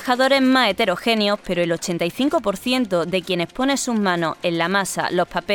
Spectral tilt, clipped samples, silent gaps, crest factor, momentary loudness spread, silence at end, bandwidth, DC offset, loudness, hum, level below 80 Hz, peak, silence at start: -4 dB/octave; under 0.1%; none; 16 dB; 6 LU; 0 s; 18 kHz; under 0.1%; -20 LUFS; none; -52 dBFS; -4 dBFS; 0 s